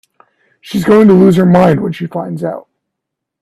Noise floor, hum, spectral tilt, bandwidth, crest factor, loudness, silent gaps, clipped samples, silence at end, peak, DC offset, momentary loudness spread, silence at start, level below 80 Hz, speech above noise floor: -77 dBFS; none; -8 dB/octave; 13 kHz; 12 dB; -10 LUFS; none; under 0.1%; 0.85 s; 0 dBFS; under 0.1%; 14 LU; 0.65 s; -46 dBFS; 68 dB